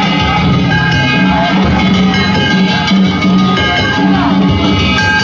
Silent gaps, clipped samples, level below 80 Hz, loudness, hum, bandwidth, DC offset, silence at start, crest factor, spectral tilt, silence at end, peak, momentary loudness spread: none; under 0.1%; -26 dBFS; -10 LUFS; none; 7.6 kHz; under 0.1%; 0 s; 8 dB; -6 dB/octave; 0 s; -2 dBFS; 1 LU